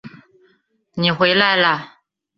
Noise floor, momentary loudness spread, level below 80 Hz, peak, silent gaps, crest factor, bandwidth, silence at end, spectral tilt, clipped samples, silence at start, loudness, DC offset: -62 dBFS; 11 LU; -62 dBFS; -2 dBFS; none; 18 dB; 6.2 kHz; 0.5 s; -6.5 dB/octave; under 0.1%; 0.05 s; -16 LUFS; under 0.1%